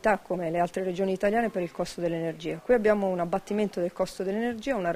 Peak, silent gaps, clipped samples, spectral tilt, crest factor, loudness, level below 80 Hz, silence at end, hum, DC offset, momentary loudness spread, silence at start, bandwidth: -10 dBFS; none; under 0.1%; -6 dB/octave; 18 dB; -28 LUFS; -56 dBFS; 0 s; none; under 0.1%; 7 LU; 0.05 s; 15.5 kHz